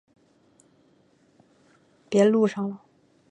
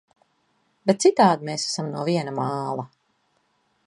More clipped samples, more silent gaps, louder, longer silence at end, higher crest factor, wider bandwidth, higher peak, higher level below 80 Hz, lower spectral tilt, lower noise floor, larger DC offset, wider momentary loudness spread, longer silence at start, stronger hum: neither; neither; about the same, -23 LUFS vs -23 LUFS; second, 0.55 s vs 1 s; about the same, 20 dB vs 20 dB; second, 9.6 kHz vs 11.5 kHz; second, -8 dBFS vs -4 dBFS; about the same, -76 dBFS vs -72 dBFS; first, -6.5 dB/octave vs -5 dB/octave; second, -62 dBFS vs -68 dBFS; neither; about the same, 15 LU vs 13 LU; first, 2.1 s vs 0.85 s; neither